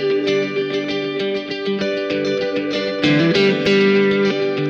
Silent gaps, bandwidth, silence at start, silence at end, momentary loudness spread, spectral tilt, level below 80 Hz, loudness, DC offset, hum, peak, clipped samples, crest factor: none; 7.6 kHz; 0 s; 0 s; 8 LU; -6 dB/octave; -56 dBFS; -18 LUFS; under 0.1%; none; -4 dBFS; under 0.1%; 14 dB